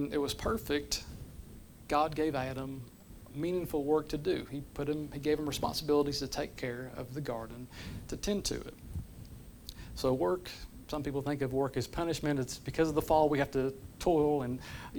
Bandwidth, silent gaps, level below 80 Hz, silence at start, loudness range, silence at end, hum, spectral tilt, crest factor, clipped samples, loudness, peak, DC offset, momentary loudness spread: over 20 kHz; none; -50 dBFS; 0 s; 6 LU; 0 s; none; -5 dB/octave; 20 dB; under 0.1%; -34 LUFS; -14 dBFS; under 0.1%; 17 LU